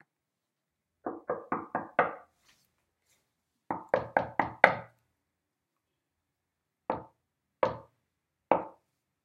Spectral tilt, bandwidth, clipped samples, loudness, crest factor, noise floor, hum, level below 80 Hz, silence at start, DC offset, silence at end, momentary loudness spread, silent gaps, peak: -6 dB/octave; 12 kHz; under 0.1%; -31 LUFS; 36 dB; -86 dBFS; none; -72 dBFS; 1.05 s; under 0.1%; 0.55 s; 18 LU; none; 0 dBFS